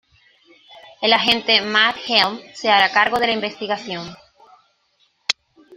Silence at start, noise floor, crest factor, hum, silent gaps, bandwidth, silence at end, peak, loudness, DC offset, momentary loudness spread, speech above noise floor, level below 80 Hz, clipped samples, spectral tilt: 0.7 s; -63 dBFS; 20 dB; none; none; 15.5 kHz; 0 s; 0 dBFS; -17 LUFS; under 0.1%; 12 LU; 45 dB; -60 dBFS; under 0.1%; -2.5 dB/octave